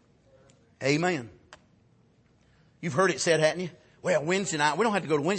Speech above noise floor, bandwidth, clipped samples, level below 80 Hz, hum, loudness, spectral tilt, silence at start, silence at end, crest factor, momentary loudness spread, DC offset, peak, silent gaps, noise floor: 37 dB; 8.8 kHz; under 0.1%; -70 dBFS; none; -27 LUFS; -4 dB/octave; 0.8 s; 0 s; 18 dB; 12 LU; under 0.1%; -10 dBFS; none; -63 dBFS